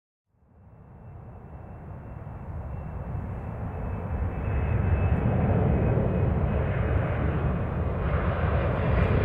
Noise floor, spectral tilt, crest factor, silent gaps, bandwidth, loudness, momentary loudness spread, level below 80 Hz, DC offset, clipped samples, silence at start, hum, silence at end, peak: -54 dBFS; -10.5 dB/octave; 16 dB; none; 4.2 kHz; -27 LUFS; 18 LU; -34 dBFS; under 0.1%; under 0.1%; 0.7 s; none; 0 s; -12 dBFS